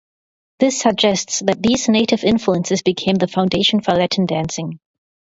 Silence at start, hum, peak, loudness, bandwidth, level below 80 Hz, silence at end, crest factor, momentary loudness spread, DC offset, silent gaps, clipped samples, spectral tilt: 0.6 s; none; 0 dBFS; -17 LUFS; 8 kHz; -50 dBFS; 0.55 s; 18 dB; 5 LU; under 0.1%; none; under 0.1%; -4.5 dB/octave